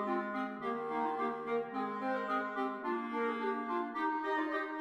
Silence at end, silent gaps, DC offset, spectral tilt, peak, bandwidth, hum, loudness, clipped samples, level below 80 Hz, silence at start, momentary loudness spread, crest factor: 0 s; none; under 0.1%; -6.5 dB/octave; -22 dBFS; 12.5 kHz; none; -36 LUFS; under 0.1%; -82 dBFS; 0 s; 3 LU; 14 dB